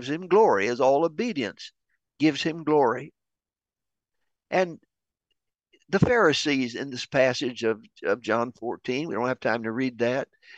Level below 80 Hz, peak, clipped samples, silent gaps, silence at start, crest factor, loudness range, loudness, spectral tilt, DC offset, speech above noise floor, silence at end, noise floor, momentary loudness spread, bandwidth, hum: -58 dBFS; -6 dBFS; under 0.1%; none; 0 s; 20 dB; 5 LU; -25 LUFS; -5.5 dB/octave; under 0.1%; over 65 dB; 0.35 s; under -90 dBFS; 11 LU; 8.6 kHz; none